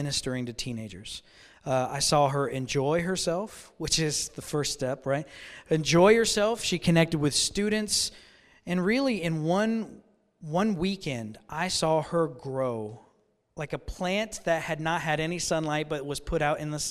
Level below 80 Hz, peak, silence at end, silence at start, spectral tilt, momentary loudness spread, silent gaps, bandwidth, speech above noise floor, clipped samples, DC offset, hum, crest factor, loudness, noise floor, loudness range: -50 dBFS; -8 dBFS; 0 s; 0 s; -4 dB/octave; 13 LU; none; 15.5 kHz; 39 dB; under 0.1%; under 0.1%; none; 20 dB; -27 LUFS; -67 dBFS; 6 LU